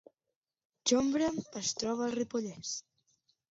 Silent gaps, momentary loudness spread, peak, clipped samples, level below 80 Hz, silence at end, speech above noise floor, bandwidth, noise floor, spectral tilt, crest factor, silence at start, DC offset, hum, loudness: none; 11 LU; -16 dBFS; under 0.1%; -68 dBFS; 0.7 s; 57 dB; 8 kHz; -89 dBFS; -3 dB/octave; 20 dB; 0.85 s; under 0.1%; none; -33 LUFS